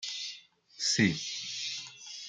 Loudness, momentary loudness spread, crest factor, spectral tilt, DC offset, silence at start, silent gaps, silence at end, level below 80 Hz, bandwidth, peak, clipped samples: -31 LUFS; 15 LU; 22 dB; -2.5 dB/octave; under 0.1%; 0 s; none; 0 s; -72 dBFS; 10.5 kHz; -14 dBFS; under 0.1%